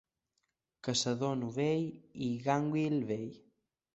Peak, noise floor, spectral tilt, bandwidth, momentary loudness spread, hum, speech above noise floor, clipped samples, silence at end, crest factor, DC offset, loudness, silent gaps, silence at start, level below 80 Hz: -16 dBFS; -83 dBFS; -5 dB/octave; 8.2 kHz; 9 LU; none; 50 dB; under 0.1%; 0.55 s; 20 dB; under 0.1%; -34 LUFS; none; 0.85 s; -72 dBFS